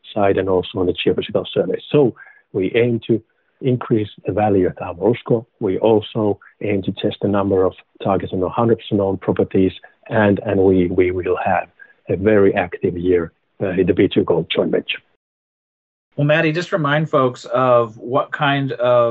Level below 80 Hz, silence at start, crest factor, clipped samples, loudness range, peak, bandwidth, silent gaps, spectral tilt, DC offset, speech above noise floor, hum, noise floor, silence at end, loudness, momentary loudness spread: -54 dBFS; 0.05 s; 14 dB; under 0.1%; 2 LU; -4 dBFS; 8 kHz; 15.16-16.11 s; -5.5 dB/octave; under 0.1%; over 73 dB; none; under -90 dBFS; 0 s; -18 LUFS; 7 LU